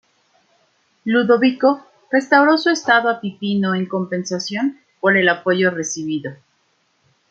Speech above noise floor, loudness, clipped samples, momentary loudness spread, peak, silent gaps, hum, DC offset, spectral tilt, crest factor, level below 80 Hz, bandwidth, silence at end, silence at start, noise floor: 47 dB; -18 LUFS; under 0.1%; 10 LU; -2 dBFS; none; none; under 0.1%; -4.5 dB/octave; 18 dB; -68 dBFS; 8 kHz; 0.95 s; 1.05 s; -64 dBFS